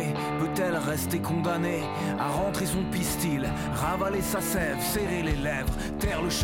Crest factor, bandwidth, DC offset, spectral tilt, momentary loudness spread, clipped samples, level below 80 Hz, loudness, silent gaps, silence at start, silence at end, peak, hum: 12 dB; 17 kHz; under 0.1%; -5 dB/octave; 2 LU; under 0.1%; -40 dBFS; -28 LUFS; none; 0 s; 0 s; -16 dBFS; none